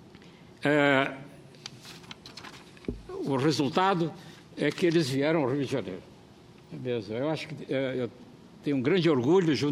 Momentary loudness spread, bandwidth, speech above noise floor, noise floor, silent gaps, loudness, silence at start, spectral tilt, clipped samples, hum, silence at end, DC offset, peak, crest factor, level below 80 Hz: 21 LU; 14 kHz; 26 dB; -53 dBFS; none; -28 LUFS; 0.2 s; -6 dB/octave; under 0.1%; none; 0 s; under 0.1%; -8 dBFS; 22 dB; -60 dBFS